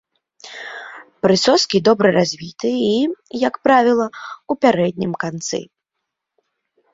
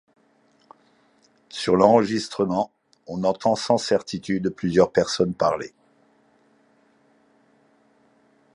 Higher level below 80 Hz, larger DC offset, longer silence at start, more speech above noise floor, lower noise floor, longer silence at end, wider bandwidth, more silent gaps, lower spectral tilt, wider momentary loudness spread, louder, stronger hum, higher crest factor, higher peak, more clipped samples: about the same, -58 dBFS vs -58 dBFS; neither; second, 0.45 s vs 1.55 s; first, 62 dB vs 40 dB; first, -79 dBFS vs -61 dBFS; second, 1.3 s vs 2.85 s; second, 7.8 kHz vs 11.5 kHz; neither; about the same, -4.5 dB/octave vs -5.5 dB/octave; first, 18 LU vs 13 LU; first, -17 LUFS vs -22 LUFS; neither; second, 18 dB vs 24 dB; about the same, 0 dBFS vs -2 dBFS; neither